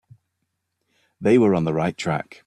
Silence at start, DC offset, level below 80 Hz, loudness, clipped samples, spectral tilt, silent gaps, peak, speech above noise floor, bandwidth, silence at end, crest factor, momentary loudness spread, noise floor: 1.2 s; under 0.1%; -58 dBFS; -21 LUFS; under 0.1%; -7 dB/octave; none; -6 dBFS; 57 dB; 11 kHz; 0.25 s; 18 dB; 9 LU; -77 dBFS